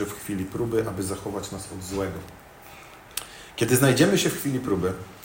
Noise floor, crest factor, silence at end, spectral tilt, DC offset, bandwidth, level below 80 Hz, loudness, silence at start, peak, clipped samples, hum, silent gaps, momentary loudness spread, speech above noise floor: -46 dBFS; 22 dB; 0 s; -4.5 dB/octave; under 0.1%; 16.5 kHz; -52 dBFS; -25 LUFS; 0 s; -4 dBFS; under 0.1%; none; none; 25 LU; 21 dB